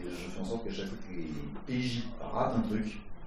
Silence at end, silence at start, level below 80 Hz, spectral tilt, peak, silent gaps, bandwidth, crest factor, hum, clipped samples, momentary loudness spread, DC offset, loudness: 0 s; 0 s; -46 dBFS; -6.5 dB/octave; -18 dBFS; none; 13.5 kHz; 18 dB; none; under 0.1%; 9 LU; under 0.1%; -36 LUFS